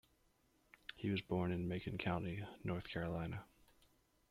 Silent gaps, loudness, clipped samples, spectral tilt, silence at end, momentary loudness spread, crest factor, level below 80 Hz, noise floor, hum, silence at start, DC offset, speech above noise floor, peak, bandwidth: none; -43 LUFS; under 0.1%; -8 dB/octave; 0.85 s; 9 LU; 18 dB; -66 dBFS; -76 dBFS; none; 0.95 s; under 0.1%; 34 dB; -26 dBFS; 14 kHz